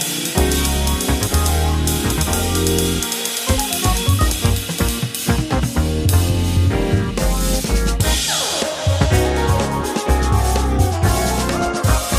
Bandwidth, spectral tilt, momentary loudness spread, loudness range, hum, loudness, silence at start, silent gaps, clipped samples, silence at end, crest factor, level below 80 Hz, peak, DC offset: 15.5 kHz; -4.5 dB/octave; 3 LU; 1 LU; none; -18 LUFS; 0 s; none; under 0.1%; 0 s; 16 dB; -22 dBFS; 0 dBFS; under 0.1%